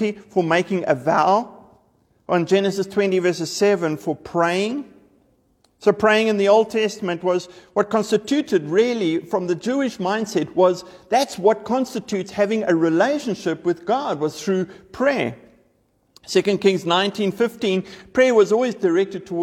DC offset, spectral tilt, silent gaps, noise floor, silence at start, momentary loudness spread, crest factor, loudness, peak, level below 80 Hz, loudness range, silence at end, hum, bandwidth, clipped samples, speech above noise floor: under 0.1%; -5 dB/octave; none; -63 dBFS; 0 s; 8 LU; 18 dB; -20 LUFS; -4 dBFS; -62 dBFS; 3 LU; 0 s; none; 15 kHz; under 0.1%; 44 dB